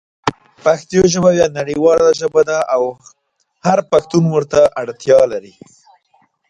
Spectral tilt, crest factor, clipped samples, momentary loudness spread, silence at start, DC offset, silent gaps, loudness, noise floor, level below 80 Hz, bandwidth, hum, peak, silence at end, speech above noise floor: -5.5 dB/octave; 14 dB; under 0.1%; 11 LU; 0.25 s; under 0.1%; none; -14 LUFS; -58 dBFS; -48 dBFS; 10.5 kHz; none; 0 dBFS; 1.1 s; 44 dB